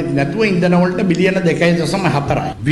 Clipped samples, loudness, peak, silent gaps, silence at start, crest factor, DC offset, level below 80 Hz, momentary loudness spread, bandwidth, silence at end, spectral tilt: under 0.1%; -15 LUFS; -2 dBFS; none; 0 s; 12 dB; under 0.1%; -40 dBFS; 4 LU; 12 kHz; 0 s; -6.5 dB/octave